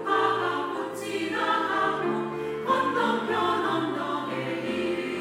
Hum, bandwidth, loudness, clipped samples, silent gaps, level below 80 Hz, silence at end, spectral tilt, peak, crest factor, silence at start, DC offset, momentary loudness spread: none; 16 kHz; -27 LUFS; under 0.1%; none; -70 dBFS; 0 s; -5 dB/octave; -10 dBFS; 16 dB; 0 s; under 0.1%; 7 LU